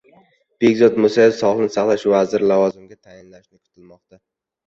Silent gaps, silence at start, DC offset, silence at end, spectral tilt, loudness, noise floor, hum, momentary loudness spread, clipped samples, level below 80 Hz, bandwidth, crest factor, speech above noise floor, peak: none; 0.6 s; under 0.1%; 1.95 s; -6 dB/octave; -16 LUFS; -60 dBFS; none; 5 LU; under 0.1%; -60 dBFS; 7.8 kHz; 16 dB; 45 dB; -2 dBFS